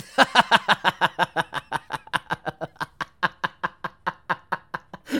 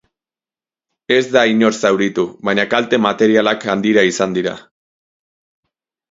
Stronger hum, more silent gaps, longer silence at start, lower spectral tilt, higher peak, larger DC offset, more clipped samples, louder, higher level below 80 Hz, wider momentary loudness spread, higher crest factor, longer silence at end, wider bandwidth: neither; neither; second, 0 s vs 1.1 s; second, -3 dB/octave vs -4.5 dB/octave; about the same, 0 dBFS vs 0 dBFS; neither; neither; second, -24 LUFS vs -15 LUFS; about the same, -60 dBFS vs -60 dBFS; first, 15 LU vs 6 LU; first, 24 dB vs 16 dB; second, 0 s vs 1.5 s; first, 19 kHz vs 7.8 kHz